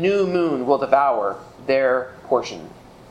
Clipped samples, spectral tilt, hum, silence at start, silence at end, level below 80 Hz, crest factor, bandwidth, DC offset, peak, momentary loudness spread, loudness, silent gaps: under 0.1%; -6 dB/octave; none; 0 s; 0.4 s; -58 dBFS; 18 dB; 9.4 kHz; under 0.1%; -2 dBFS; 12 LU; -20 LUFS; none